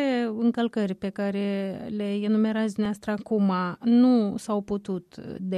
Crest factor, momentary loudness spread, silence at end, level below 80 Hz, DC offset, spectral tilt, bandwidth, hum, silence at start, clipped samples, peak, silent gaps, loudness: 14 dB; 10 LU; 0 s; -64 dBFS; under 0.1%; -7 dB/octave; 11.5 kHz; none; 0 s; under 0.1%; -12 dBFS; none; -26 LUFS